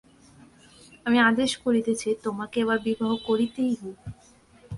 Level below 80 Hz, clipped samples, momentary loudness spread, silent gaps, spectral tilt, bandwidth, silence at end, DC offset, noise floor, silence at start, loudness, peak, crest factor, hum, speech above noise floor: -58 dBFS; under 0.1%; 13 LU; none; -4.5 dB/octave; 11.5 kHz; 0 s; under 0.1%; -55 dBFS; 1.05 s; -25 LUFS; -10 dBFS; 18 dB; none; 30 dB